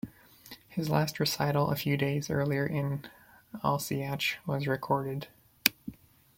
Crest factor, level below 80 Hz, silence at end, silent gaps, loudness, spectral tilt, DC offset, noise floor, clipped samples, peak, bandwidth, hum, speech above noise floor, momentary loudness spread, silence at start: 32 dB; -62 dBFS; 0.45 s; none; -31 LUFS; -5 dB/octave; under 0.1%; -53 dBFS; under 0.1%; 0 dBFS; 16.5 kHz; none; 23 dB; 19 LU; 0.05 s